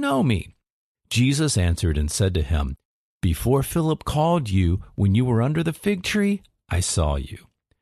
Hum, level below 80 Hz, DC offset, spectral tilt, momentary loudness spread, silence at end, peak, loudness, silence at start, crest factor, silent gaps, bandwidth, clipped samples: none; -32 dBFS; under 0.1%; -5.5 dB/octave; 8 LU; 0.45 s; -8 dBFS; -23 LUFS; 0 s; 14 dB; 0.70-0.95 s, 2.85-3.20 s; 14 kHz; under 0.1%